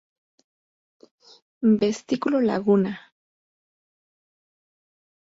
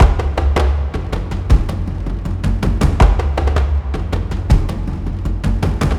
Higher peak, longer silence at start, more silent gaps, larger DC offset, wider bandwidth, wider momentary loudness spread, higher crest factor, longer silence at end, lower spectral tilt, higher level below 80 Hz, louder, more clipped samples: second, -8 dBFS vs 0 dBFS; first, 1.6 s vs 0 s; neither; neither; second, 7.8 kHz vs 11.5 kHz; about the same, 7 LU vs 9 LU; about the same, 18 dB vs 14 dB; first, 2.2 s vs 0 s; about the same, -7 dB/octave vs -7 dB/octave; second, -68 dBFS vs -16 dBFS; second, -22 LUFS vs -18 LUFS; neither